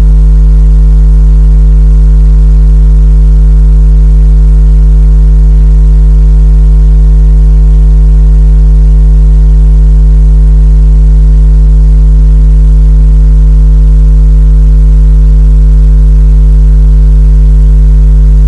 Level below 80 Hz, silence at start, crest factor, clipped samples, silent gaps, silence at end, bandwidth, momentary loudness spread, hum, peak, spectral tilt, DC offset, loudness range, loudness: -2 dBFS; 0 s; 2 dB; 0.4%; none; 0 s; 1.5 kHz; 0 LU; none; 0 dBFS; -9.5 dB/octave; 0.2%; 0 LU; -6 LUFS